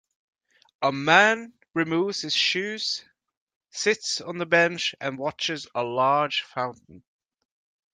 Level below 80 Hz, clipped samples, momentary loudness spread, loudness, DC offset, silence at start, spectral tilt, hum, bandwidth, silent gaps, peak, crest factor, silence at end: -72 dBFS; under 0.1%; 12 LU; -24 LUFS; under 0.1%; 0.8 s; -3 dB/octave; none; 9.6 kHz; 3.37-3.47 s, 3.56-3.61 s; -2 dBFS; 24 dB; 0.95 s